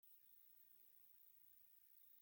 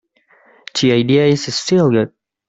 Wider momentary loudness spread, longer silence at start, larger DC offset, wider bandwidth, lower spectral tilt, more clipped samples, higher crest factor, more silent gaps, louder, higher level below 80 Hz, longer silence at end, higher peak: second, 1 LU vs 8 LU; second, 0 s vs 0.75 s; neither; first, 17 kHz vs 8.4 kHz; second, -0.5 dB/octave vs -5.5 dB/octave; neither; about the same, 12 dB vs 14 dB; neither; second, -66 LUFS vs -15 LUFS; second, under -90 dBFS vs -56 dBFS; second, 0 s vs 0.4 s; second, -58 dBFS vs -2 dBFS